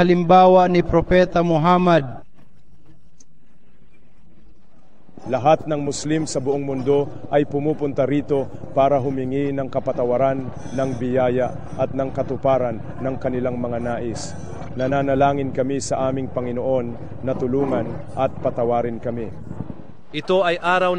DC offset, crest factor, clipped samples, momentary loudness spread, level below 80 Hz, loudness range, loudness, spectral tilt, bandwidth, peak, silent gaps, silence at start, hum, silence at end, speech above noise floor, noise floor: 2%; 18 dB; under 0.1%; 13 LU; -44 dBFS; 4 LU; -20 LUFS; -6.5 dB/octave; 10 kHz; -4 dBFS; none; 0 s; none; 0 s; 37 dB; -57 dBFS